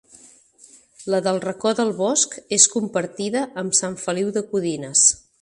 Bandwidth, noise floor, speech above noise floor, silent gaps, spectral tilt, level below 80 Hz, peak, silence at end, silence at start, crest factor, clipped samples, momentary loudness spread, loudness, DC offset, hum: 11.5 kHz; -51 dBFS; 30 dB; none; -2.5 dB/octave; -64 dBFS; 0 dBFS; 0.25 s; 1 s; 22 dB; under 0.1%; 10 LU; -20 LUFS; under 0.1%; none